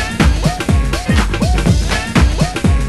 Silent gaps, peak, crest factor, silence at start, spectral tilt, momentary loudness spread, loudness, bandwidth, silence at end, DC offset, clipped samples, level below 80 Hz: none; 0 dBFS; 12 dB; 0 s; -5.5 dB/octave; 2 LU; -15 LUFS; 12.5 kHz; 0 s; under 0.1%; under 0.1%; -16 dBFS